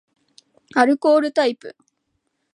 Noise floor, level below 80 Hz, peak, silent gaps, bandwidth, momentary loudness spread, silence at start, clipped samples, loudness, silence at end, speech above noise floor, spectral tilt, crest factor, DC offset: -73 dBFS; -78 dBFS; -2 dBFS; none; 11 kHz; 8 LU; 0.75 s; under 0.1%; -18 LUFS; 0.85 s; 55 dB; -4 dB/octave; 20 dB; under 0.1%